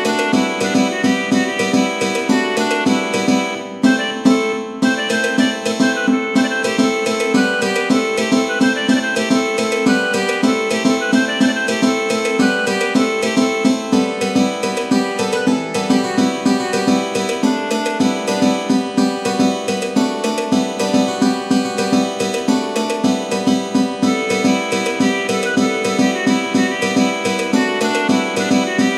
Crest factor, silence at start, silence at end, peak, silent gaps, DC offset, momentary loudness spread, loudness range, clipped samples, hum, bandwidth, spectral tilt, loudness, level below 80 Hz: 16 dB; 0 s; 0 s; 0 dBFS; none; under 0.1%; 3 LU; 2 LU; under 0.1%; none; 13.5 kHz; -4 dB/octave; -17 LUFS; -62 dBFS